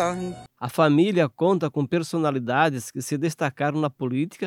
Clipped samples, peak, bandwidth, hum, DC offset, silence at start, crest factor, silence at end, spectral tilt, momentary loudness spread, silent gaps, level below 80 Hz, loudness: under 0.1%; -6 dBFS; 16.5 kHz; none; under 0.1%; 0 s; 18 dB; 0 s; -6 dB/octave; 11 LU; none; -64 dBFS; -24 LUFS